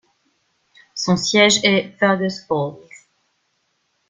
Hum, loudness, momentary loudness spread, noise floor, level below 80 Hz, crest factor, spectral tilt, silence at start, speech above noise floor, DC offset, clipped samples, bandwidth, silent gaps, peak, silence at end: none; -17 LUFS; 12 LU; -68 dBFS; -60 dBFS; 20 dB; -3.5 dB/octave; 0.95 s; 51 dB; under 0.1%; under 0.1%; 9.6 kHz; none; -2 dBFS; 1.3 s